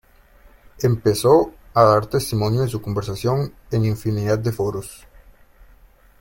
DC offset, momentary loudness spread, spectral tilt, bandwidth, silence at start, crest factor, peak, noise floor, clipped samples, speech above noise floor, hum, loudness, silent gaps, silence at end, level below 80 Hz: under 0.1%; 10 LU; -6.5 dB/octave; 17 kHz; 0.8 s; 20 dB; -2 dBFS; -50 dBFS; under 0.1%; 31 dB; none; -20 LUFS; none; 1.25 s; -46 dBFS